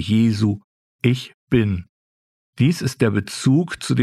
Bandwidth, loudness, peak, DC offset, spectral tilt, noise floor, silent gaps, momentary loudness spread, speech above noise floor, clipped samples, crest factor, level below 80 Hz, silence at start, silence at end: 13.5 kHz; -20 LUFS; -2 dBFS; under 0.1%; -6.5 dB/octave; under -90 dBFS; 0.64-0.99 s, 1.34-1.47 s, 1.89-2.53 s; 6 LU; over 71 dB; under 0.1%; 18 dB; -50 dBFS; 0 s; 0 s